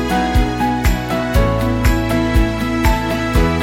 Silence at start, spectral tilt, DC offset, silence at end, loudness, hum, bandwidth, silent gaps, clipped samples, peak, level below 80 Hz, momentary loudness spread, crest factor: 0 s; -6 dB/octave; under 0.1%; 0 s; -17 LUFS; none; 17 kHz; none; under 0.1%; -2 dBFS; -20 dBFS; 2 LU; 12 dB